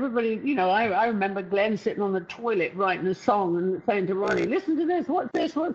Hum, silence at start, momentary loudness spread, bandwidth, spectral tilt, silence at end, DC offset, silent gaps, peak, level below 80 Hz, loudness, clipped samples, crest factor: none; 0 s; 4 LU; 7.8 kHz; -6.5 dB/octave; 0 s; under 0.1%; none; -8 dBFS; -66 dBFS; -25 LUFS; under 0.1%; 18 dB